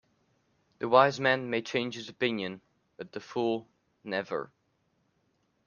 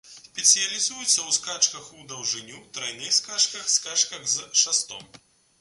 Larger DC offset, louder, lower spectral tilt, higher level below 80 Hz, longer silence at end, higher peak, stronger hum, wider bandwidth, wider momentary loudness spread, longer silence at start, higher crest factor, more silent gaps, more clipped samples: neither; second, -29 LUFS vs -22 LUFS; first, -5 dB/octave vs 2 dB/octave; about the same, -74 dBFS vs -72 dBFS; first, 1.2 s vs 0.55 s; about the same, -6 dBFS vs -4 dBFS; neither; second, 7.4 kHz vs 12 kHz; first, 21 LU vs 16 LU; first, 0.8 s vs 0.05 s; about the same, 26 dB vs 22 dB; neither; neither